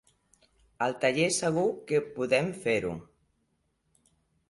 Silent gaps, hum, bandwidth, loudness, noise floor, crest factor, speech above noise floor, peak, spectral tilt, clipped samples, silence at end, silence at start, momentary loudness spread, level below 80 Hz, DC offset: none; none; 11.5 kHz; -28 LUFS; -75 dBFS; 20 dB; 47 dB; -10 dBFS; -4 dB/octave; under 0.1%; 1.45 s; 0.8 s; 6 LU; -64 dBFS; under 0.1%